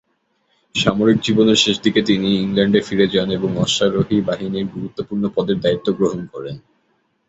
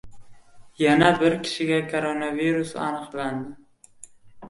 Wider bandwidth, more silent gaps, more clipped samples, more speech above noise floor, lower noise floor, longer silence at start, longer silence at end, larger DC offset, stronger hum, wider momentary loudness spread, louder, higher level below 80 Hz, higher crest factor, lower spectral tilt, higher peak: second, 8 kHz vs 11.5 kHz; neither; neither; first, 48 dB vs 26 dB; first, -66 dBFS vs -49 dBFS; first, 0.75 s vs 0.05 s; first, 0.7 s vs 0 s; neither; neither; about the same, 12 LU vs 12 LU; first, -18 LUFS vs -23 LUFS; first, -50 dBFS vs -58 dBFS; about the same, 16 dB vs 20 dB; about the same, -5 dB/octave vs -5.5 dB/octave; about the same, -2 dBFS vs -4 dBFS